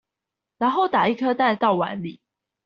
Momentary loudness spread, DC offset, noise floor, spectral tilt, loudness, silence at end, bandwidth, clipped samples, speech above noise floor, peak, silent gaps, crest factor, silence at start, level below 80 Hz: 10 LU; under 0.1%; -86 dBFS; -3.5 dB/octave; -21 LUFS; 0.5 s; 6.8 kHz; under 0.1%; 65 dB; -6 dBFS; none; 16 dB; 0.6 s; -68 dBFS